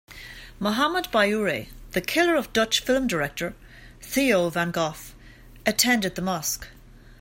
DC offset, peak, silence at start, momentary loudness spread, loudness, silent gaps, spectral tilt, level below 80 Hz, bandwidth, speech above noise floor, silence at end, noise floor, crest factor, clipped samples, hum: under 0.1%; -4 dBFS; 0.1 s; 18 LU; -24 LUFS; none; -3.5 dB/octave; -48 dBFS; 16.5 kHz; 23 dB; 0.25 s; -47 dBFS; 20 dB; under 0.1%; none